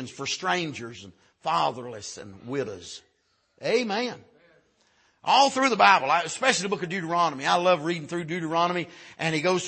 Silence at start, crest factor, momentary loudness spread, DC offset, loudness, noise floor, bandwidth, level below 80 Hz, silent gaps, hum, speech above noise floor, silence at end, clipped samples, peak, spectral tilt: 0 s; 22 dB; 19 LU; under 0.1%; -25 LUFS; -70 dBFS; 8.8 kHz; -72 dBFS; none; none; 45 dB; 0 s; under 0.1%; -4 dBFS; -3.5 dB/octave